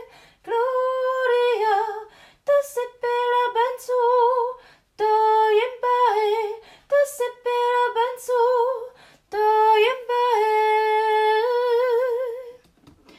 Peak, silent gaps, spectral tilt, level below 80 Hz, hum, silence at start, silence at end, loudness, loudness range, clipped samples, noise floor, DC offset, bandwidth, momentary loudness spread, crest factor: -8 dBFS; none; -1 dB/octave; -68 dBFS; none; 0 s; 0.65 s; -21 LUFS; 3 LU; under 0.1%; -54 dBFS; under 0.1%; 15 kHz; 11 LU; 14 dB